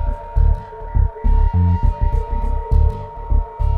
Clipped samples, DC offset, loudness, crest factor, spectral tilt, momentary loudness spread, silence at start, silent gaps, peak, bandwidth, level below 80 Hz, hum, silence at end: under 0.1%; under 0.1%; -20 LUFS; 12 dB; -10.5 dB/octave; 7 LU; 0 s; none; -4 dBFS; 3 kHz; -18 dBFS; none; 0 s